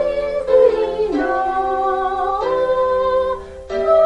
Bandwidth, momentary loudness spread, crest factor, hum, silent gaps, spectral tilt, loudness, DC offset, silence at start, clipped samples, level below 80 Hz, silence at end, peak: 8.8 kHz; 8 LU; 14 dB; none; none; -6 dB/octave; -18 LUFS; under 0.1%; 0 s; under 0.1%; -42 dBFS; 0 s; -2 dBFS